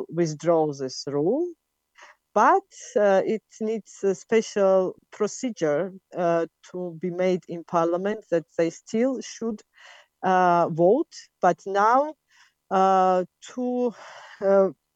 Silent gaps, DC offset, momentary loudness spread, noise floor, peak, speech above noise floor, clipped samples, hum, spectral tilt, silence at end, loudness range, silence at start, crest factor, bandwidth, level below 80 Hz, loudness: none; under 0.1%; 12 LU; -61 dBFS; -6 dBFS; 37 dB; under 0.1%; none; -6 dB/octave; 0.25 s; 4 LU; 0 s; 18 dB; 8.6 kHz; -76 dBFS; -24 LUFS